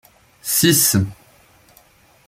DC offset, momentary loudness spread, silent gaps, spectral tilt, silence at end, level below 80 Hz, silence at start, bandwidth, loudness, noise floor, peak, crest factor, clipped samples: under 0.1%; 15 LU; none; -3 dB/octave; 1.15 s; -54 dBFS; 0.45 s; 16.5 kHz; -15 LUFS; -52 dBFS; -2 dBFS; 18 dB; under 0.1%